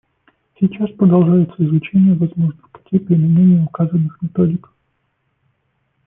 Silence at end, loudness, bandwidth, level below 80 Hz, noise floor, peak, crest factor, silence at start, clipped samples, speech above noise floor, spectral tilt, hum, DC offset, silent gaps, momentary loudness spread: 1.5 s; -15 LUFS; 3.4 kHz; -54 dBFS; -67 dBFS; -2 dBFS; 14 dB; 0.6 s; under 0.1%; 53 dB; -14 dB/octave; none; under 0.1%; none; 9 LU